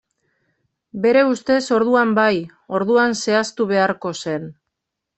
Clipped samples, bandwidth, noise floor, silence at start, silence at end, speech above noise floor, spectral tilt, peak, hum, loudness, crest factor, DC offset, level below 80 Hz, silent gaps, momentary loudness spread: under 0.1%; 8.4 kHz; -79 dBFS; 0.95 s; 0.65 s; 62 dB; -4.5 dB/octave; -4 dBFS; none; -18 LUFS; 16 dB; under 0.1%; -62 dBFS; none; 10 LU